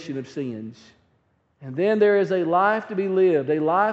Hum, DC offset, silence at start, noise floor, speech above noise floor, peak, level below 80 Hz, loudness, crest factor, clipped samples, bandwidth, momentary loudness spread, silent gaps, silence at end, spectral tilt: none; under 0.1%; 0 s; -66 dBFS; 45 dB; -6 dBFS; -72 dBFS; -21 LUFS; 16 dB; under 0.1%; 7.6 kHz; 16 LU; none; 0 s; -5.5 dB/octave